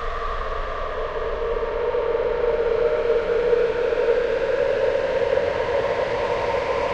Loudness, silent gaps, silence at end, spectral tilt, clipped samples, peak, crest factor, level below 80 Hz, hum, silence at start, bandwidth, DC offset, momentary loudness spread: -23 LUFS; none; 0 s; -5.5 dB/octave; under 0.1%; -8 dBFS; 14 dB; -36 dBFS; none; 0 s; 8 kHz; under 0.1%; 7 LU